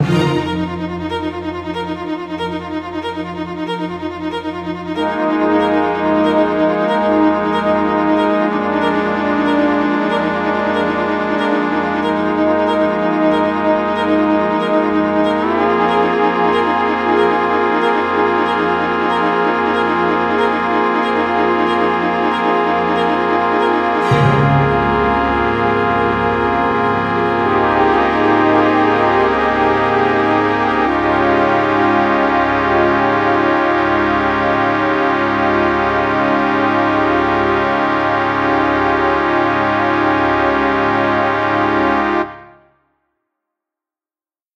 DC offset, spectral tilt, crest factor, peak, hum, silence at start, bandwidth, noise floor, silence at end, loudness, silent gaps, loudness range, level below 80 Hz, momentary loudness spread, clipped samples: under 0.1%; -7 dB/octave; 14 dB; 0 dBFS; none; 0 s; 9 kHz; under -90 dBFS; 2.1 s; -15 LUFS; none; 4 LU; -42 dBFS; 7 LU; under 0.1%